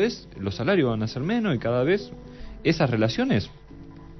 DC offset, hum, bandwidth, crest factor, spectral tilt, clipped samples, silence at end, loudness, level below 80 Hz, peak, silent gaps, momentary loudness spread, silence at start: under 0.1%; none; 6.2 kHz; 18 dB; -7 dB/octave; under 0.1%; 0 s; -25 LUFS; -48 dBFS; -8 dBFS; none; 19 LU; 0 s